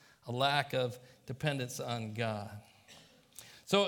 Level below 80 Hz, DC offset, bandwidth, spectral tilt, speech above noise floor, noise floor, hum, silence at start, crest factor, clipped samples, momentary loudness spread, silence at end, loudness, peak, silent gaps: -72 dBFS; under 0.1%; 18 kHz; -4.5 dB/octave; 24 dB; -60 dBFS; none; 0.25 s; 22 dB; under 0.1%; 23 LU; 0 s; -35 LUFS; -14 dBFS; none